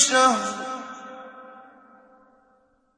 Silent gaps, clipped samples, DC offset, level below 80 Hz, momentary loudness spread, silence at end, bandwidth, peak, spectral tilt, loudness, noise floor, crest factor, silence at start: none; under 0.1%; under 0.1%; -74 dBFS; 26 LU; 1.35 s; 10.5 kHz; -4 dBFS; -0.5 dB/octave; -22 LUFS; -63 dBFS; 22 dB; 0 s